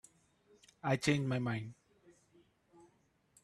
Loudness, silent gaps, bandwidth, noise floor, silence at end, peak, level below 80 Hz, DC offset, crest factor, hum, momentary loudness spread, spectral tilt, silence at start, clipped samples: -36 LUFS; none; 12.5 kHz; -73 dBFS; 1.7 s; -18 dBFS; -70 dBFS; under 0.1%; 22 dB; none; 10 LU; -5.5 dB/octave; 0.85 s; under 0.1%